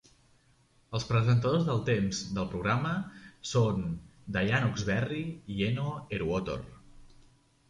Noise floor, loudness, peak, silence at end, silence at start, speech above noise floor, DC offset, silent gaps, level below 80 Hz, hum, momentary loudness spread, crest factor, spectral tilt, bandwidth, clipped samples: -65 dBFS; -31 LUFS; -14 dBFS; 0.65 s; 0.9 s; 36 dB; under 0.1%; none; -52 dBFS; none; 11 LU; 18 dB; -6 dB/octave; 10.5 kHz; under 0.1%